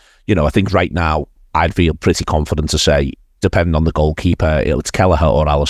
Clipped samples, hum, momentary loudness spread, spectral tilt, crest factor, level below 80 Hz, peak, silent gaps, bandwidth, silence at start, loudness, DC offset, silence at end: under 0.1%; none; 5 LU; -5.5 dB/octave; 14 dB; -22 dBFS; 0 dBFS; none; 14 kHz; 0.3 s; -15 LUFS; under 0.1%; 0 s